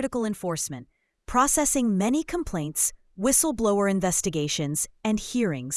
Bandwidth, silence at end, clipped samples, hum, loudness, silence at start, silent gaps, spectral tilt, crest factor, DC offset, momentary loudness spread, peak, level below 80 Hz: 12 kHz; 0 s; under 0.1%; none; -24 LUFS; 0 s; none; -4 dB/octave; 20 dB; under 0.1%; 8 LU; -6 dBFS; -48 dBFS